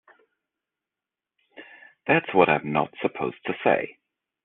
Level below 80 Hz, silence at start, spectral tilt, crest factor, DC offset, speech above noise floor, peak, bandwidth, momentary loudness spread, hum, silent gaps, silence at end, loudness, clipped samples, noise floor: -66 dBFS; 1.6 s; -4 dB/octave; 24 dB; under 0.1%; 66 dB; -4 dBFS; 4.2 kHz; 14 LU; none; none; 0.55 s; -24 LUFS; under 0.1%; -89 dBFS